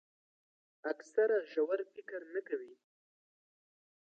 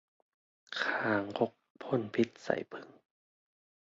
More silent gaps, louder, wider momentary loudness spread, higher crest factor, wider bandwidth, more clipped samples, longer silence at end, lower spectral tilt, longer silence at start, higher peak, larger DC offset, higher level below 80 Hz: second, none vs 1.70-1.75 s; second, -37 LUFS vs -34 LUFS; about the same, 13 LU vs 14 LU; about the same, 20 dB vs 22 dB; about the same, 7.6 kHz vs 7.6 kHz; neither; first, 1.45 s vs 0.9 s; second, -2 dB/octave vs -3.5 dB/octave; first, 0.85 s vs 0.7 s; second, -18 dBFS vs -14 dBFS; neither; second, under -90 dBFS vs -76 dBFS